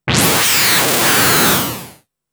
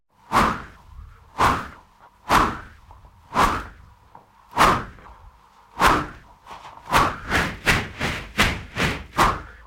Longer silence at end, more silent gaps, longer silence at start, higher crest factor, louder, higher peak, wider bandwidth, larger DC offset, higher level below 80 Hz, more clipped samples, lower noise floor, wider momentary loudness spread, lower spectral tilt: first, 0.4 s vs 0.15 s; neither; second, 0.05 s vs 0.3 s; second, 12 dB vs 20 dB; first, -11 LUFS vs -21 LUFS; about the same, -2 dBFS vs -4 dBFS; first, over 20 kHz vs 16.5 kHz; neither; about the same, -42 dBFS vs -38 dBFS; neither; second, -40 dBFS vs -51 dBFS; second, 8 LU vs 21 LU; second, -2 dB/octave vs -4 dB/octave